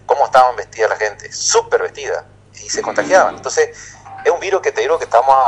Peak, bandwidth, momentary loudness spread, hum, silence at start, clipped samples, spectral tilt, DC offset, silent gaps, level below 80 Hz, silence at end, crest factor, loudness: 0 dBFS; 10.5 kHz; 12 LU; 50 Hz at -50 dBFS; 0.1 s; 0.1%; -1.5 dB/octave; under 0.1%; none; -52 dBFS; 0 s; 16 dB; -16 LUFS